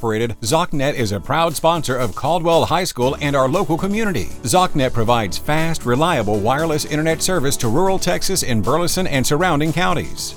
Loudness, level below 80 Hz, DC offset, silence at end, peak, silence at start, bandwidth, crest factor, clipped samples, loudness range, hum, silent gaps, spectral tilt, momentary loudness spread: -18 LUFS; -32 dBFS; under 0.1%; 0 s; -2 dBFS; 0 s; 19 kHz; 16 dB; under 0.1%; 0 LU; none; none; -4.5 dB/octave; 4 LU